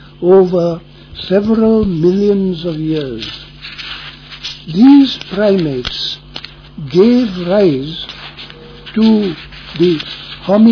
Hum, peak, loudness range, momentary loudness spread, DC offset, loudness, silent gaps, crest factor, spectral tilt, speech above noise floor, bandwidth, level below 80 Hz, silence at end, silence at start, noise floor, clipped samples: none; 0 dBFS; 3 LU; 19 LU; under 0.1%; -13 LUFS; none; 12 dB; -7.5 dB/octave; 22 dB; 5.4 kHz; -40 dBFS; 0 s; 0.2 s; -33 dBFS; under 0.1%